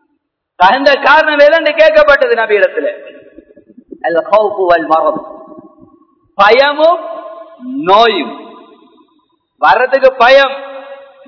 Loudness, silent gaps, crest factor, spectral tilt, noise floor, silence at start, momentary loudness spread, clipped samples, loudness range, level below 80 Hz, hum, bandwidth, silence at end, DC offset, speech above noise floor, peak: -9 LUFS; none; 12 dB; -4 dB/octave; -66 dBFS; 0.6 s; 20 LU; 2%; 5 LU; -48 dBFS; none; 5.4 kHz; 0.3 s; under 0.1%; 57 dB; 0 dBFS